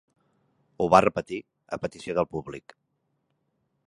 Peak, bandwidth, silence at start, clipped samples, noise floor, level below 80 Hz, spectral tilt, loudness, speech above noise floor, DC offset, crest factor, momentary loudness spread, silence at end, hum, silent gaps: -2 dBFS; 11.5 kHz; 0.8 s; under 0.1%; -75 dBFS; -58 dBFS; -6 dB/octave; -25 LUFS; 50 dB; under 0.1%; 26 dB; 18 LU; 1.25 s; none; none